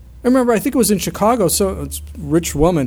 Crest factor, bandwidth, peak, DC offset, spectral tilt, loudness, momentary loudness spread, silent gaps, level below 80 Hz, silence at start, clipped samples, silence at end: 14 dB; over 20 kHz; -2 dBFS; under 0.1%; -5 dB/octave; -16 LUFS; 10 LU; none; -32 dBFS; 0 s; under 0.1%; 0 s